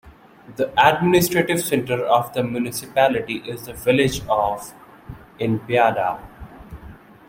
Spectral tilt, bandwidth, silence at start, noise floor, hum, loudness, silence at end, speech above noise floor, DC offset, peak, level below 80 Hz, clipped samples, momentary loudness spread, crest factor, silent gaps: -5 dB/octave; 16.5 kHz; 0.05 s; -42 dBFS; none; -20 LUFS; 0.35 s; 23 dB; under 0.1%; 0 dBFS; -48 dBFS; under 0.1%; 24 LU; 20 dB; none